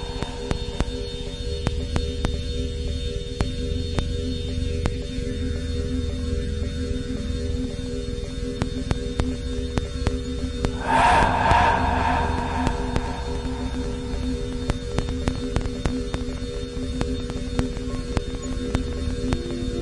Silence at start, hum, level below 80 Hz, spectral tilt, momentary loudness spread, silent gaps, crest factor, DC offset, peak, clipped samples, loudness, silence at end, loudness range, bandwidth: 0 s; none; -30 dBFS; -6 dB/octave; 9 LU; none; 22 dB; under 0.1%; -2 dBFS; under 0.1%; -26 LUFS; 0 s; 7 LU; 11.5 kHz